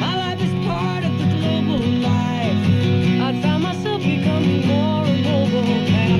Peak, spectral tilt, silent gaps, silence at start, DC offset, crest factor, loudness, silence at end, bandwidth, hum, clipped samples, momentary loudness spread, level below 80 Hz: -6 dBFS; -7 dB/octave; none; 0 s; 0.3%; 12 dB; -19 LUFS; 0 s; 11 kHz; none; under 0.1%; 4 LU; -46 dBFS